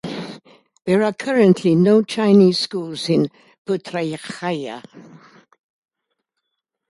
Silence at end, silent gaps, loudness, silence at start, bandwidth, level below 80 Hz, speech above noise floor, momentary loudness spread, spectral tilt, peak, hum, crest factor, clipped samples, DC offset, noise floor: 1.9 s; 3.58-3.65 s; -18 LUFS; 0.05 s; 11.5 kHz; -64 dBFS; 61 dB; 18 LU; -6.5 dB/octave; -2 dBFS; none; 18 dB; under 0.1%; under 0.1%; -78 dBFS